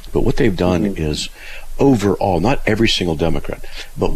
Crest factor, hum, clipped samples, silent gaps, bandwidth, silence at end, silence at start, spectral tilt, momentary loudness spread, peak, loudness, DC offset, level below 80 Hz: 14 dB; none; under 0.1%; none; 14.5 kHz; 0 s; 0 s; -5.5 dB/octave; 15 LU; -4 dBFS; -17 LUFS; under 0.1%; -26 dBFS